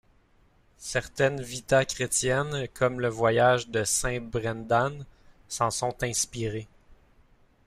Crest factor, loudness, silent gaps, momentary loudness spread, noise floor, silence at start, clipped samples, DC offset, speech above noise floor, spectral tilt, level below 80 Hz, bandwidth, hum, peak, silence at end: 18 dB; -27 LUFS; none; 10 LU; -62 dBFS; 0.8 s; under 0.1%; under 0.1%; 35 dB; -3.5 dB/octave; -50 dBFS; 15.5 kHz; none; -10 dBFS; 0.7 s